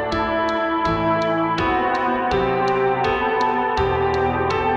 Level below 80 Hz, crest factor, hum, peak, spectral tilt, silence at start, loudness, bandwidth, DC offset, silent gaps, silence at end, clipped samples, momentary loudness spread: -38 dBFS; 12 dB; none; -6 dBFS; -6.5 dB/octave; 0 s; -20 LUFS; 8 kHz; under 0.1%; none; 0 s; under 0.1%; 1 LU